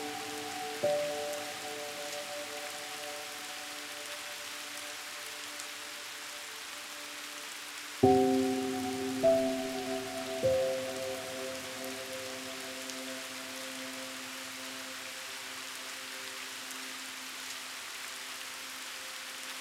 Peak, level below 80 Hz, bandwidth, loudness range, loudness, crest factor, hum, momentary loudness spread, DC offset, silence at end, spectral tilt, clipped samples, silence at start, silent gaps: -10 dBFS; -70 dBFS; 16.5 kHz; 9 LU; -36 LUFS; 26 dB; none; 10 LU; under 0.1%; 0 s; -3 dB/octave; under 0.1%; 0 s; none